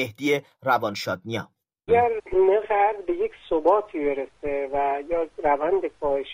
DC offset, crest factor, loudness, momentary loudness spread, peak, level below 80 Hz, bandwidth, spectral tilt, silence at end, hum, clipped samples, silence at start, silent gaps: under 0.1%; 16 dB; -24 LUFS; 9 LU; -8 dBFS; -52 dBFS; 16 kHz; -5.5 dB/octave; 0 s; none; under 0.1%; 0 s; none